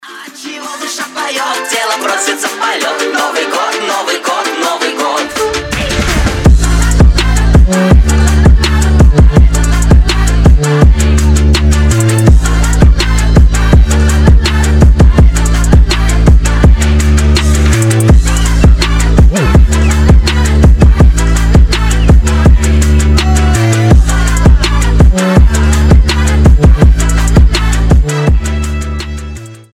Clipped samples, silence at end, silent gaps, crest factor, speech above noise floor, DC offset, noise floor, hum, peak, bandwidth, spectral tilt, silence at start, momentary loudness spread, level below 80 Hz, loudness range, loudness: 2%; 0.2 s; none; 6 dB; 13 dB; under 0.1%; -27 dBFS; none; 0 dBFS; 15 kHz; -5.5 dB/octave; 0.05 s; 7 LU; -8 dBFS; 5 LU; -9 LUFS